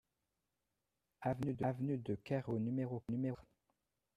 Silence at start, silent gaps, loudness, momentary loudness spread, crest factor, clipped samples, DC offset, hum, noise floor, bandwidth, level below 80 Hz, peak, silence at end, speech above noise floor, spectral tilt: 1.2 s; none; -41 LUFS; 4 LU; 18 dB; under 0.1%; under 0.1%; none; -89 dBFS; 10 kHz; -70 dBFS; -24 dBFS; 0.75 s; 49 dB; -9.5 dB/octave